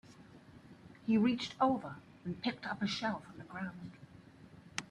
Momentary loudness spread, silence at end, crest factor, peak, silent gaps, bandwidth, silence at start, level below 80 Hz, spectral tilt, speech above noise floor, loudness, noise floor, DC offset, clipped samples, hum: 26 LU; 0.05 s; 20 dB; -18 dBFS; none; 11 kHz; 0.05 s; -72 dBFS; -5.5 dB/octave; 22 dB; -36 LUFS; -57 dBFS; under 0.1%; under 0.1%; none